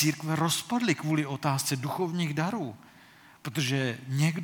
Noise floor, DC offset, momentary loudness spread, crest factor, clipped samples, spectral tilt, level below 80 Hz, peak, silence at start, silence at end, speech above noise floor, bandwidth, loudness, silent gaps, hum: -55 dBFS; under 0.1%; 6 LU; 18 dB; under 0.1%; -4.5 dB/octave; -74 dBFS; -10 dBFS; 0 s; 0 s; 26 dB; 19 kHz; -29 LUFS; none; none